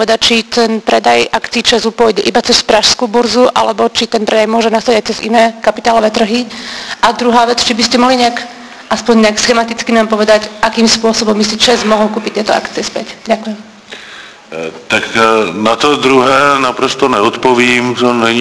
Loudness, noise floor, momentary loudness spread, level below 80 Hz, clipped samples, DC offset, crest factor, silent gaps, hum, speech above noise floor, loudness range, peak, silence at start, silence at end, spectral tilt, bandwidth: -10 LUFS; -32 dBFS; 13 LU; -44 dBFS; 0.5%; 0.2%; 10 dB; none; none; 22 dB; 4 LU; 0 dBFS; 0 s; 0 s; -3 dB/octave; 11 kHz